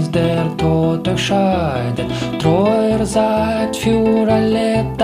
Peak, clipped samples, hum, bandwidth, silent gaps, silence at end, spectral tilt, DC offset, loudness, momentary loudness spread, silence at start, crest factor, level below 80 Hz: -2 dBFS; under 0.1%; none; 15 kHz; none; 0 s; -6.5 dB/octave; under 0.1%; -16 LUFS; 5 LU; 0 s; 14 dB; -36 dBFS